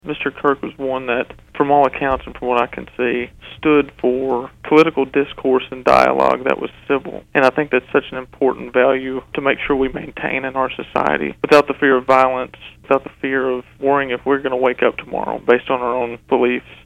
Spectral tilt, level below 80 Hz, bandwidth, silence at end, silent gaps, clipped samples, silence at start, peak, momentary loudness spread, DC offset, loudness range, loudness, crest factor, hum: -6 dB/octave; -46 dBFS; 12 kHz; 0.1 s; none; under 0.1%; 0.05 s; 0 dBFS; 9 LU; under 0.1%; 3 LU; -17 LUFS; 16 dB; none